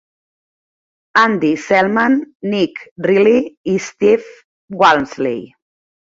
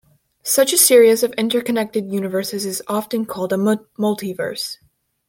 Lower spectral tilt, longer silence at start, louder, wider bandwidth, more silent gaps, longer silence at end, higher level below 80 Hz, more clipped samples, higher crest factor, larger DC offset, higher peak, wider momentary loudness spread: first, -5.5 dB/octave vs -3 dB/octave; first, 1.15 s vs 0.45 s; first, -15 LUFS vs -18 LUFS; second, 7.8 kHz vs 17 kHz; first, 2.35-2.40 s, 2.91-2.96 s, 3.57-3.64 s, 4.44-4.68 s vs none; about the same, 0.55 s vs 0.55 s; first, -58 dBFS vs -66 dBFS; neither; about the same, 16 dB vs 18 dB; neither; about the same, 0 dBFS vs 0 dBFS; second, 9 LU vs 13 LU